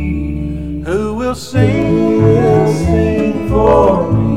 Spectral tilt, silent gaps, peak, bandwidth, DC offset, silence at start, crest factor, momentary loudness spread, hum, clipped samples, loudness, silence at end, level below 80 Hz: -8 dB/octave; none; 0 dBFS; 13 kHz; 2%; 0 s; 12 dB; 10 LU; none; under 0.1%; -13 LUFS; 0 s; -26 dBFS